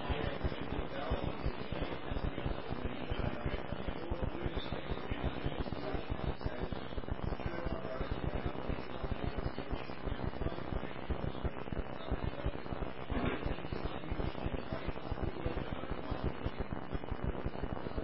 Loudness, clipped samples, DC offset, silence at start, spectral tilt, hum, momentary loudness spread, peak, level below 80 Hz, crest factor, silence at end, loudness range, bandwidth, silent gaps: -40 LUFS; under 0.1%; 0.8%; 0 s; -5.5 dB/octave; none; 3 LU; -22 dBFS; -44 dBFS; 16 dB; 0 s; 1 LU; 5.6 kHz; none